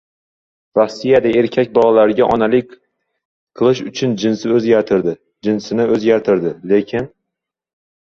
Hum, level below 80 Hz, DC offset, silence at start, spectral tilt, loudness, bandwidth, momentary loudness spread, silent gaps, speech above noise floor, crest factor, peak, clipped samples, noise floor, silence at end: none; -52 dBFS; under 0.1%; 0.75 s; -6.5 dB/octave; -15 LUFS; 7.4 kHz; 8 LU; 3.25-3.47 s; 66 dB; 16 dB; 0 dBFS; under 0.1%; -81 dBFS; 1.1 s